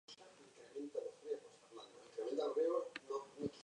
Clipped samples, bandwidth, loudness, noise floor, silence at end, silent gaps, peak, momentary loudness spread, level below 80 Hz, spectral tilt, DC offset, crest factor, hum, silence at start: under 0.1%; 10.5 kHz; -44 LUFS; -62 dBFS; 0 s; none; -28 dBFS; 20 LU; -84 dBFS; -5 dB/octave; under 0.1%; 18 dB; none; 0.1 s